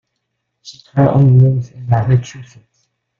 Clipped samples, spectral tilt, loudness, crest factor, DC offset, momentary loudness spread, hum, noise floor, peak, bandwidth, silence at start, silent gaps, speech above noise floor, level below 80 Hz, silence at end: under 0.1%; -9 dB/octave; -13 LUFS; 14 dB; under 0.1%; 12 LU; none; -72 dBFS; -2 dBFS; 7 kHz; 0.65 s; none; 59 dB; -46 dBFS; 0.75 s